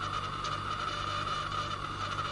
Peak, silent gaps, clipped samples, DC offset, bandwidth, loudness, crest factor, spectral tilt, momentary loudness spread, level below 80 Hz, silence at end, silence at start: -22 dBFS; none; under 0.1%; under 0.1%; 11.5 kHz; -34 LUFS; 14 dB; -3.5 dB/octave; 2 LU; -52 dBFS; 0 s; 0 s